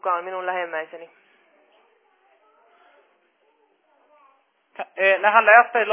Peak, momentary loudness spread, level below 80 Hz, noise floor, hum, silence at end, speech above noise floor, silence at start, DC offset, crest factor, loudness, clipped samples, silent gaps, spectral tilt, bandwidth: -2 dBFS; 24 LU; under -90 dBFS; -64 dBFS; none; 0 s; 45 dB; 0.05 s; under 0.1%; 22 dB; -18 LUFS; under 0.1%; none; -5.5 dB/octave; 3.7 kHz